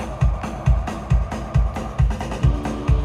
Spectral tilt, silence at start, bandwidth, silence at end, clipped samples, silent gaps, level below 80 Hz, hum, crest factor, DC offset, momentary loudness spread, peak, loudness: -7.5 dB/octave; 0 s; 10.5 kHz; 0 s; under 0.1%; none; -22 dBFS; none; 14 dB; under 0.1%; 2 LU; -6 dBFS; -22 LUFS